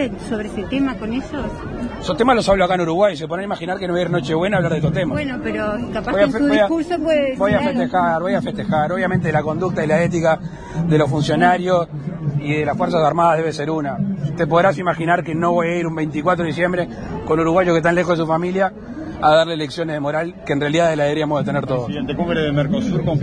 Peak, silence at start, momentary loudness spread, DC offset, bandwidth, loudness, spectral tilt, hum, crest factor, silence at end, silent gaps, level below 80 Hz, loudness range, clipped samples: -2 dBFS; 0 s; 9 LU; under 0.1%; 10.5 kHz; -19 LUFS; -6.5 dB/octave; none; 16 dB; 0 s; none; -42 dBFS; 2 LU; under 0.1%